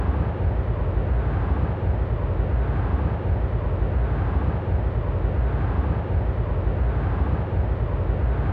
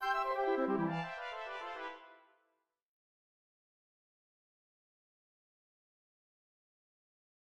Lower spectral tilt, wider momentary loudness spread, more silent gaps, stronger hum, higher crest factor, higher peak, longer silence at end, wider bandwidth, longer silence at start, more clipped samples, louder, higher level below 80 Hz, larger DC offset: first, -11 dB/octave vs -6.5 dB/octave; second, 1 LU vs 12 LU; neither; neither; second, 10 dB vs 20 dB; first, -12 dBFS vs -22 dBFS; second, 0 s vs 5.4 s; second, 4.2 kHz vs 15 kHz; about the same, 0 s vs 0 s; neither; first, -25 LUFS vs -37 LUFS; first, -24 dBFS vs -76 dBFS; neither